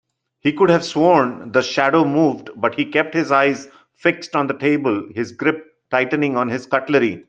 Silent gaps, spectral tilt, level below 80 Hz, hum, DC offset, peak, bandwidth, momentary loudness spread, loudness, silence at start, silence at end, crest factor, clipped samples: none; -6 dB/octave; -64 dBFS; none; under 0.1%; 0 dBFS; 8.6 kHz; 7 LU; -18 LUFS; 0.45 s; 0.1 s; 18 dB; under 0.1%